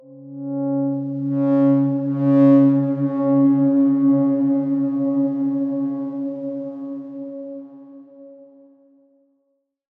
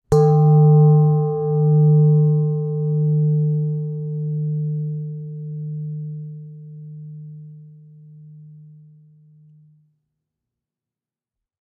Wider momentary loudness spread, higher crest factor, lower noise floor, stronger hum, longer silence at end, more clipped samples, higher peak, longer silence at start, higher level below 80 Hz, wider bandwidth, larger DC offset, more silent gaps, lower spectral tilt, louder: second, 17 LU vs 24 LU; about the same, 14 dB vs 14 dB; second, -71 dBFS vs -90 dBFS; neither; second, 1.55 s vs 3.2 s; neither; about the same, -4 dBFS vs -4 dBFS; about the same, 0.1 s vs 0.1 s; second, -80 dBFS vs -52 dBFS; first, 2.8 kHz vs 1.7 kHz; neither; neither; about the same, -12 dB/octave vs -11.5 dB/octave; about the same, -19 LUFS vs -18 LUFS